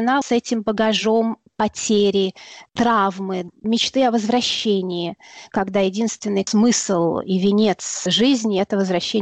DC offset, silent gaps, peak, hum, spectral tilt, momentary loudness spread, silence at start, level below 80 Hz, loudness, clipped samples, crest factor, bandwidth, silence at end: under 0.1%; none; -8 dBFS; none; -4 dB/octave; 9 LU; 0 s; -58 dBFS; -19 LUFS; under 0.1%; 12 dB; 8.8 kHz; 0 s